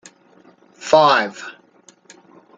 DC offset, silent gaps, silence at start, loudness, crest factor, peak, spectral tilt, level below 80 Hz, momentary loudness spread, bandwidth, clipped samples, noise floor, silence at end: under 0.1%; none; 0.8 s; -15 LUFS; 20 dB; 0 dBFS; -3.5 dB/octave; -68 dBFS; 23 LU; 9 kHz; under 0.1%; -52 dBFS; 1.05 s